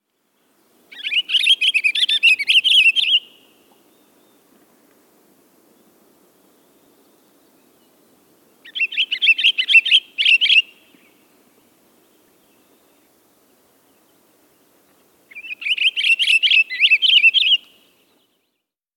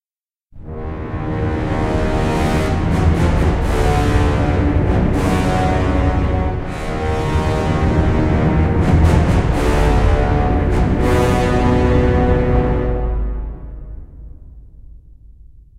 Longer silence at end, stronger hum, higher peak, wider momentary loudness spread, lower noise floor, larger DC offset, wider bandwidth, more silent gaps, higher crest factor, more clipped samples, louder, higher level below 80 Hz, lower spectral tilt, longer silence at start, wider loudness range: first, 1.4 s vs 0.2 s; neither; about the same, -2 dBFS vs 0 dBFS; about the same, 11 LU vs 10 LU; second, -76 dBFS vs under -90 dBFS; neither; first, 17.5 kHz vs 13.5 kHz; neither; about the same, 18 dB vs 14 dB; neither; first, -13 LUFS vs -17 LUFS; second, -86 dBFS vs -20 dBFS; second, 3.5 dB/octave vs -7.5 dB/octave; first, 0.95 s vs 0.55 s; first, 9 LU vs 4 LU